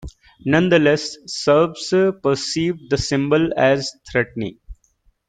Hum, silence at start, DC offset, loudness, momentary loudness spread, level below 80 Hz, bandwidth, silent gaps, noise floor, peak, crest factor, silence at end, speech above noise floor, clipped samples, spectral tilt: none; 0 s; under 0.1%; -19 LUFS; 9 LU; -46 dBFS; 9.4 kHz; none; -61 dBFS; -2 dBFS; 18 dB; 0.55 s; 43 dB; under 0.1%; -5 dB/octave